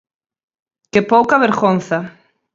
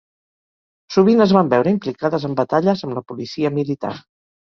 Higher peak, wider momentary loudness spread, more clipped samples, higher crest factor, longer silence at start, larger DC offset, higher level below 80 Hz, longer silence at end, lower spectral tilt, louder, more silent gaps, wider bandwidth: about the same, 0 dBFS vs -2 dBFS; second, 10 LU vs 14 LU; neither; about the same, 16 dB vs 18 dB; about the same, 0.95 s vs 0.9 s; neither; about the same, -58 dBFS vs -58 dBFS; about the same, 0.45 s vs 0.55 s; about the same, -6.5 dB/octave vs -7.5 dB/octave; first, -15 LUFS vs -18 LUFS; neither; first, 7.8 kHz vs 6.8 kHz